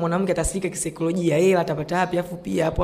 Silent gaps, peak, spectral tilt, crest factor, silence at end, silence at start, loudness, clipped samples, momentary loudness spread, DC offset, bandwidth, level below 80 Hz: none; -10 dBFS; -5.5 dB/octave; 12 dB; 0 s; 0 s; -23 LUFS; under 0.1%; 8 LU; under 0.1%; 15.5 kHz; -38 dBFS